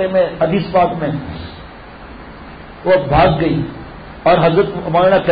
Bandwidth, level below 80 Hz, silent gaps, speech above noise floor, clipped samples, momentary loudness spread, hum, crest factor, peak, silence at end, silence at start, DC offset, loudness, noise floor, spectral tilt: 5 kHz; -34 dBFS; none; 21 dB; under 0.1%; 22 LU; none; 12 dB; -2 dBFS; 0 s; 0 s; under 0.1%; -15 LUFS; -34 dBFS; -12 dB/octave